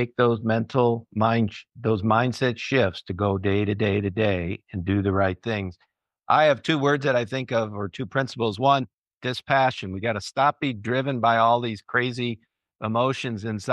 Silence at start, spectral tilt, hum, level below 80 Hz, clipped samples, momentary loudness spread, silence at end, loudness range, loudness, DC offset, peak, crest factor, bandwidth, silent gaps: 0 s; -6.5 dB/octave; none; -58 dBFS; under 0.1%; 9 LU; 0 s; 1 LU; -24 LUFS; under 0.1%; -6 dBFS; 18 dB; 11.5 kHz; 8.94-9.11 s, 9.17-9.21 s